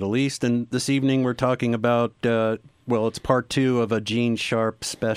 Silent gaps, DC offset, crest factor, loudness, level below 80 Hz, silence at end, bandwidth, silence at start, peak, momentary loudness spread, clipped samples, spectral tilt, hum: none; under 0.1%; 18 dB; -23 LUFS; -54 dBFS; 0 s; 15 kHz; 0 s; -4 dBFS; 4 LU; under 0.1%; -5.5 dB/octave; none